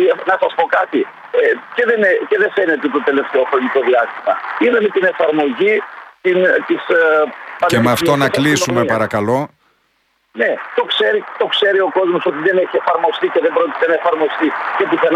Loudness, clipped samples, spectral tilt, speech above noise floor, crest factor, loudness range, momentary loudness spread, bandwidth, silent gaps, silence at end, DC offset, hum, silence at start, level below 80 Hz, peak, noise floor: -15 LUFS; under 0.1%; -4.5 dB/octave; 47 dB; 14 dB; 2 LU; 5 LU; 15.5 kHz; none; 0 s; under 0.1%; none; 0 s; -58 dBFS; -2 dBFS; -62 dBFS